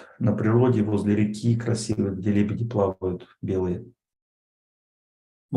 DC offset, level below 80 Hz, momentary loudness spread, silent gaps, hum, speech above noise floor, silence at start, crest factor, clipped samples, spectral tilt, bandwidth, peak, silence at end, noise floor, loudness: under 0.1%; -60 dBFS; 10 LU; 4.22-5.49 s; none; over 67 dB; 0 s; 16 dB; under 0.1%; -7.5 dB/octave; 11 kHz; -8 dBFS; 0 s; under -90 dBFS; -24 LUFS